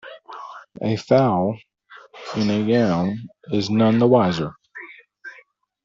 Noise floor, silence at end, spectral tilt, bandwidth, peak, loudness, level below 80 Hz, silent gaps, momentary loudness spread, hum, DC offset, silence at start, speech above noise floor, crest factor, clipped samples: -53 dBFS; 0.55 s; -6 dB/octave; 7.6 kHz; -4 dBFS; -20 LUFS; -58 dBFS; none; 23 LU; none; under 0.1%; 0.05 s; 34 dB; 18 dB; under 0.1%